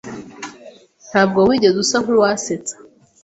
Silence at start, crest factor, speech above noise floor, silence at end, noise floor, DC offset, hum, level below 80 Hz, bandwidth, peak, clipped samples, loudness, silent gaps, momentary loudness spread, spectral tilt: 0.05 s; 16 dB; 28 dB; 0.5 s; -43 dBFS; under 0.1%; none; -54 dBFS; 8.2 kHz; -2 dBFS; under 0.1%; -16 LUFS; none; 20 LU; -4 dB/octave